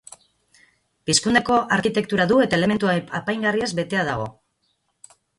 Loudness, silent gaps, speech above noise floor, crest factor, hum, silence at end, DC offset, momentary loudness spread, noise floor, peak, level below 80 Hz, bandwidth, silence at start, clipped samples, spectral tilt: -20 LUFS; none; 50 dB; 20 dB; none; 1.1 s; under 0.1%; 8 LU; -70 dBFS; -4 dBFS; -54 dBFS; 11.5 kHz; 1.05 s; under 0.1%; -4 dB/octave